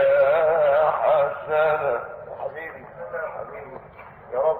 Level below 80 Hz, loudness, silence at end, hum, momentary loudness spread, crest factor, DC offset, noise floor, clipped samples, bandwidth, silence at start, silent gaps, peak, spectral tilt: -58 dBFS; -22 LUFS; 0 s; none; 18 LU; 14 dB; under 0.1%; -44 dBFS; under 0.1%; 4.2 kHz; 0 s; none; -8 dBFS; -7.5 dB/octave